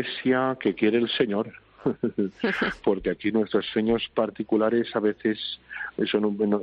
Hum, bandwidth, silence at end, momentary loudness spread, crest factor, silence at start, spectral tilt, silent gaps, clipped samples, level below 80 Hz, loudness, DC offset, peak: none; 6.6 kHz; 0 s; 7 LU; 16 dB; 0 s; -4 dB/octave; none; under 0.1%; -56 dBFS; -26 LUFS; under 0.1%; -8 dBFS